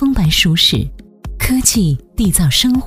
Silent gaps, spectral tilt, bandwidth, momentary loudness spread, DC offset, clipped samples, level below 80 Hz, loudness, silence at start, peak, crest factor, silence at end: none; -3.5 dB/octave; 16 kHz; 10 LU; under 0.1%; under 0.1%; -26 dBFS; -13 LUFS; 0 s; 0 dBFS; 14 dB; 0 s